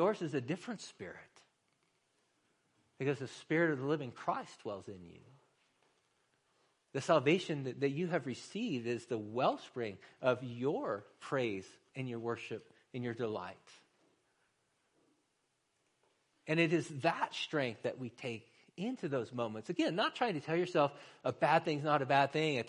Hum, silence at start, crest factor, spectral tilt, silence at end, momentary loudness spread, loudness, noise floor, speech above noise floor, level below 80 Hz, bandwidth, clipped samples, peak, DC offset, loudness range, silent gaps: none; 0 s; 22 dB; -6 dB/octave; 0 s; 15 LU; -36 LUFS; -80 dBFS; 44 dB; -80 dBFS; 10.5 kHz; under 0.1%; -16 dBFS; under 0.1%; 9 LU; none